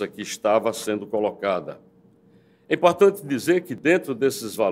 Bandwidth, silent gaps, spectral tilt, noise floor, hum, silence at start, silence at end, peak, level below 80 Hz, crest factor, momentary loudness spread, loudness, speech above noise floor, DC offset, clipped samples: 16 kHz; none; -4.5 dB/octave; -56 dBFS; none; 0 s; 0 s; -2 dBFS; -70 dBFS; 20 dB; 9 LU; -22 LUFS; 34 dB; under 0.1%; under 0.1%